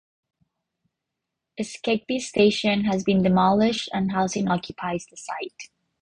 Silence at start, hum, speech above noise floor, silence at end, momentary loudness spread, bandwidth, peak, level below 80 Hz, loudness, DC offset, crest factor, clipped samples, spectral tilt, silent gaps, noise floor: 1.6 s; none; 61 dB; 0.35 s; 15 LU; 10 kHz; -6 dBFS; -56 dBFS; -23 LUFS; under 0.1%; 18 dB; under 0.1%; -5.5 dB/octave; none; -83 dBFS